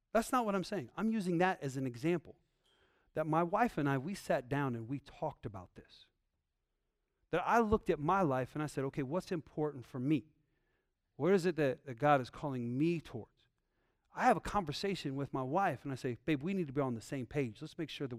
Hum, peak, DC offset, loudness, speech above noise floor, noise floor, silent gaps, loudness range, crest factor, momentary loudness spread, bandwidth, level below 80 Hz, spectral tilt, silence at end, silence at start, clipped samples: none; -16 dBFS; under 0.1%; -36 LUFS; 50 dB; -85 dBFS; none; 3 LU; 20 dB; 10 LU; 15.5 kHz; -62 dBFS; -6.5 dB/octave; 0 s; 0.15 s; under 0.1%